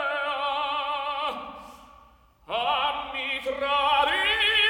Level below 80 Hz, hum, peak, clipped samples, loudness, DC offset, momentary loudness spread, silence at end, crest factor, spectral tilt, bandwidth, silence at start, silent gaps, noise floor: -56 dBFS; none; -10 dBFS; under 0.1%; -25 LUFS; under 0.1%; 11 LU; 0 s; 18 dB; -1.5 dB/octave; 19 kHz; 0 s; none; -56 dBFS